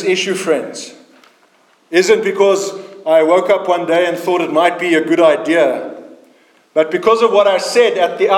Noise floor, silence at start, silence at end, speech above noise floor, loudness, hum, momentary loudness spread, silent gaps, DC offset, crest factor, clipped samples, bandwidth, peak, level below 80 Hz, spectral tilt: -53 dBFS; 0 s; 0 s; 40 dB; -14 LUFS; none; 10 LU; none; under 0.1%; 14 dB; under 0.1%; 17 kHz; 0 dBFS; -68 dBFS; -3.5 dB/octave